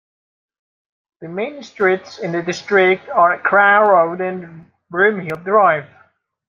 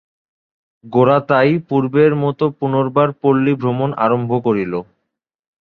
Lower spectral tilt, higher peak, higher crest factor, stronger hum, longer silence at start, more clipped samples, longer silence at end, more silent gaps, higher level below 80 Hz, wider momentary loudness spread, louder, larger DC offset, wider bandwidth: second, -5.5 dB/octave vs -10 dB/octave; about the same, -2 dBFS vs 0 dBFS; about the same, 16 dB vs 16 dB; neither; first, 1.2 s vs 0.85 s; neither; second, 0.65 s vs 0.8 s; neither; second, -66 dBFS vs -56 dBFS; first, 14 LU vs 6 LU; about the same, -16 LUFS vs -16 LUFS; neither; first, 7.2 kHz vs 4.8 kHz